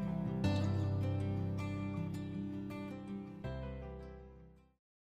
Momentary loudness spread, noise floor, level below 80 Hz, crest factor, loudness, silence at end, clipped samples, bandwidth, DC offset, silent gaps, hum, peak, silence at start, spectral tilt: 15 LU; -59 dBFS; -56 dBFS; 16 dB; -40 LUFS; 0.5 s; under 0.1%; 8.6 kHz; under 0.1%; none; none; -24 dBFS; 0 s; -8 dB/octave